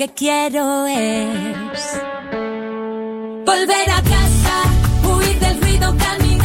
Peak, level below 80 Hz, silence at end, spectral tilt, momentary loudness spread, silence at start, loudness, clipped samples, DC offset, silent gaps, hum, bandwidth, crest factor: -2 dBFS; -22 dBFS; 0 s; -4.5 dB/octave; 11 LU; 0 s; -17 LUFS; under 0.1%; under 0.1%; none; none; 16.5 kHz; 14 dB